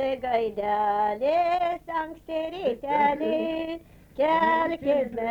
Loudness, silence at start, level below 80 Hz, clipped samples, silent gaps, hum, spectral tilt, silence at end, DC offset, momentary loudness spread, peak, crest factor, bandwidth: -26 LUFS; 0 s; -56 dBFS; under 0.1%; none; none; -6 dB/octave; 0 s; under 0.1%; 9 LU; -12 dBFS; 14 dB; 20 kHz